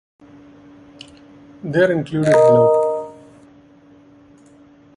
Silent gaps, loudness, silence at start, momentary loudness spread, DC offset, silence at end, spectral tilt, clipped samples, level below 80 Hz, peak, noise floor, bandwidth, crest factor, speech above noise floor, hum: none; -15 LUFS; 1.65 s; 17 LU; under 0.1%; 1.85 s; -7 dB/octave; under 0.1%; -58 dBFS; -2 dBFS; -48 dBFS; 11.5 kHz; 18 dB; 34 dB; none